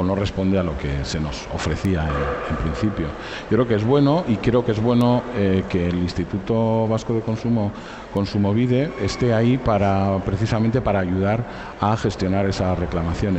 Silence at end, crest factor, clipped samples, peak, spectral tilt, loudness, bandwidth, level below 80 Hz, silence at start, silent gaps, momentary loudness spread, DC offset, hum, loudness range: 0 s; 14 dB; under 0.1%; -6 dBFS; -7.5 dB/octave; -21 LUFS; 8.4 kHz; -36 dBFS; 0 s; none; 7 LU; under 0.1%; none; 3 LU